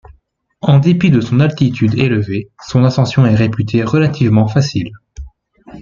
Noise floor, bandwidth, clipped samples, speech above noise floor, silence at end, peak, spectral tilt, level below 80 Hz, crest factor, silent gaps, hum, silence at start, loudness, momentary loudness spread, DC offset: -55 dBFS; 7.4 kHz; under 0.1%; 43 dB; 0 s; 0 dBFS; -7.5 dB/octave; -42 dBFS; 12 dB; none; none; 0.65 s; -13 LUFS; 8 LU; under 0.1%